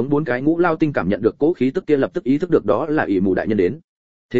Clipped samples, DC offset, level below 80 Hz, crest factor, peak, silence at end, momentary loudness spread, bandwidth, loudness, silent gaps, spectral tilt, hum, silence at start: under 0.1%; 0.8%; -50 dBFS; 16 dB; -2 dBFS; 0 s; 3 LU; 7.4 kHz; -19 LUFS; 3.84-4.29 s; -9 dB/octave; none; 0 s